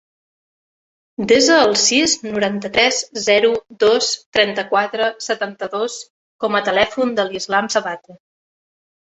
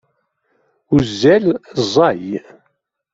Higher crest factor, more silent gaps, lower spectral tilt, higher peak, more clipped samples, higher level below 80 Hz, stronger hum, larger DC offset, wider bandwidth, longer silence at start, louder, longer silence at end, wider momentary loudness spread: about the same, 18 dB vs 16 dB; first, 4.26-4.33 s, 6.10-6.39 s vs none; second, -2 dB/octave vs -6 dB/octave; about the same, -2 dBFS vs -2 dBFS; neither; second, -56 dBFS vs -46 dBFS; neither; neither; about the same, 8.4 kHz vs 7.8 kHz; first, 1.2 s vs 0.9 s; about the same, -17 LUFS vs -15 LUFS; first, 0.9 s vs 0.75 s; about the same, 11 LU vs 12 LU